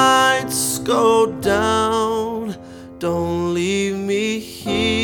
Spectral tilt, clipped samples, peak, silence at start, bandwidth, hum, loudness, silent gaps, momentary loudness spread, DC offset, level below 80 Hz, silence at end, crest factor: -3.5 dB/octave; under 0.1%; -2 dBFS; 0 s; 19.5 kHz; none; -19 LUFS; none; 11 LU; under 0.1%; -46 dBFS; 0 s; 16 dB